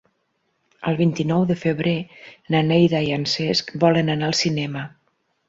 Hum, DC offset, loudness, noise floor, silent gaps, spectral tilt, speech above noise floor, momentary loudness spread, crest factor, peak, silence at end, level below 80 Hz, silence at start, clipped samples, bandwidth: none; under 0.1%; -21 LUFS; -70 dBFS; none; -5.5 dB/octave; 50 dB; 11 LU; 18 dB; -4 dBFS; 0.6 s; -58 dBFS; 0.8 s; under 0.1%; 7.8 kHz